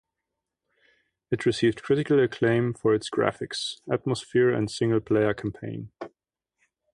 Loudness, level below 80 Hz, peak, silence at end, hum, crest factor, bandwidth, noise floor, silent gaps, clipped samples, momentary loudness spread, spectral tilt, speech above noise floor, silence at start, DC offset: -25 LUFS; -60 dBFS; -6 dBFS; 0.85 s; none; 20 dB; 11.5 kHz; -85 dBFS; none; under 0.1%; 14 LU; -6 dB/octave; 60 dB; 1.3 s; under 0.1%